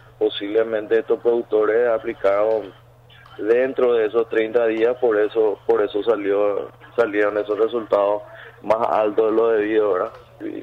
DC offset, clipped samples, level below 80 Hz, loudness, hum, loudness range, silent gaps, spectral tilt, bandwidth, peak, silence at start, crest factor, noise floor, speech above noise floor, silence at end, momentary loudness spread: under 0.1%; under 0.1%; -60 dBFS; -20 LUFS; none; 2 LU; none; -6.5 dB/octave; 5.4 kHz; -8 dBFS; 0.2 s; 12 dB; -47 dBFS; 28 dB; 0 s; 8 LU